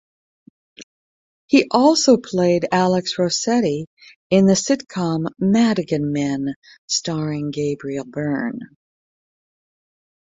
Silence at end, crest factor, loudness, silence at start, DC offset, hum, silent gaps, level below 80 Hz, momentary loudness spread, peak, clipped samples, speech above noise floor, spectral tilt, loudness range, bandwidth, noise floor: 1.6 s; 18 dB; -19 LUFS; 0.8 s; under 0.1%; none; 0.83-1.48 s, 3.87-3.97 s, 4.16-4.30 s, 6.56-6.62 s, 6.78-6.88 s; -60 dBFS; 11 LU; -2 dBFS; under 0.1%; over 71 dB; -5 dB/octave; 8 LU; 8.2 kHz; under -90 dBFS